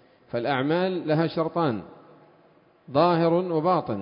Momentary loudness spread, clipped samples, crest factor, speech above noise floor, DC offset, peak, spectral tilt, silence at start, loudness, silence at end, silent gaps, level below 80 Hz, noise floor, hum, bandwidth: 7 LU; under 0.1%; 18 dB; 35 dB; under 0.1%; -8 dBFS; -11.5 dB/octave; 0.35 s; -24 LUFS; 0 s; none; -66 dBFS; -58 dBFS; none; 5.4 kHz